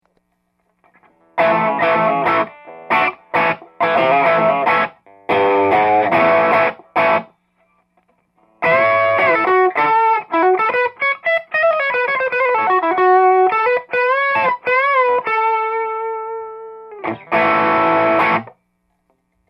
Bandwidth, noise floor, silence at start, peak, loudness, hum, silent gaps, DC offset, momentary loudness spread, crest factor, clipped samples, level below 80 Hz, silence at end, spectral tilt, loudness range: 6 kHz; -67 dBFS; 1.35 s; -2 dBFS; -15 LUFS; none; none; under 0.1%; 8 LU; 14 dB; under 0.1%; -62 dBFS; 1 s; -6.5 dB/octave; 3 LU